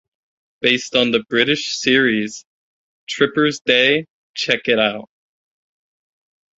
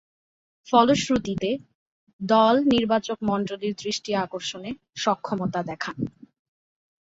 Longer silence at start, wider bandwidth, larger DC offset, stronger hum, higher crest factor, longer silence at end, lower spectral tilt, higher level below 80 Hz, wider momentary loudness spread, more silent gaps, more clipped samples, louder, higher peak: about the same, 0.6 s vs 0.65 s; about the same, 8 kHz vs 8 kHz; neither; neither; about the same, 20 dB vs 22 dB; first, 1.5 s vs 0.95 s; second, -3.5 dB/octave vs -5 dB/octave; about the same, -60 dBFS vs -58 dBFS; about the same, 13 LU vs 14 LU; first, 2.46-3.07 s, 3.61-3.65 s, 4.10-4.34 s vs 1.75-2.07 s, 2.13-2.19 s; neither; first, -17 LUFS vs -24 LUFS; first, 0 dBFS vs -4 dBFS